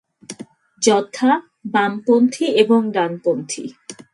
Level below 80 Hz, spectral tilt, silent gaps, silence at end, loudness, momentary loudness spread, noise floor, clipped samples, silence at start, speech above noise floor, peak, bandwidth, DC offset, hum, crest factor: -70 dBFS; -4 dB/octave; none; 0.2 s; -18 LUFS; 20 LU; -40 dBFS; under 0.1%; 0.3 s; 22 dB; 0 dBFS; 11.5 kHz; under 0.1%; none; 18 dB